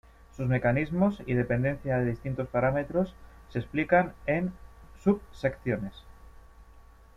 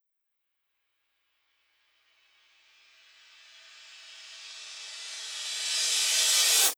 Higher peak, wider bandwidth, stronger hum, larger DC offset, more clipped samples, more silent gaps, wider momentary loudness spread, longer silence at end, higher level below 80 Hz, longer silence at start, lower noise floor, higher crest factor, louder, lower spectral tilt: about the same, -10 dBFS vs -10 dBFS; second, 7.4 kHz vs over 20 kHz; second, none vs 60 Hz at -95 dBFS; neither; neither; neither; second, 9 LU vs 26 LU; first, 0.35 s vs 0.05 s; first, -50 dBFS vs under -90 dBFS; second, 0.35 s vs 3.7 s; second, -53 dBFS vs -81 dBFS; about the same, 20 dB vs 22 dB; second, -29 LUFS vs -25 LUFS; first, -9 dB/octave vs 6.5 dB/octave